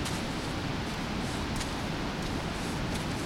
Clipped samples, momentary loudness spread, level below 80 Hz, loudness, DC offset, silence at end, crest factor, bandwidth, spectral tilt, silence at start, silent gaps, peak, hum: under 0.1%; 1 LU; -42 dBFS; -33 LUFS; under 0.1%; 0 s; 12 dB; 16.5 kHz; -4.5 dB/octave; 0 s; none; -20 dBFS; none